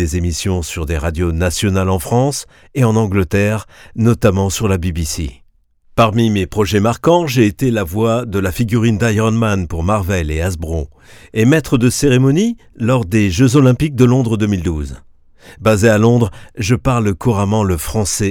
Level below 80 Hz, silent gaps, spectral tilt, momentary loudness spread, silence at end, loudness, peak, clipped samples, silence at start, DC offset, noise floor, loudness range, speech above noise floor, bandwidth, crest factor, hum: -30 dBFS; none; -6 dB/octave; 9 LU; 0 s; -15 LUFS; 0 dBFS; under 0.1%; 0 s; under 0.1%; -51 dBFS; 3 LU; 37 dB; 18 kHz; 14 dB; none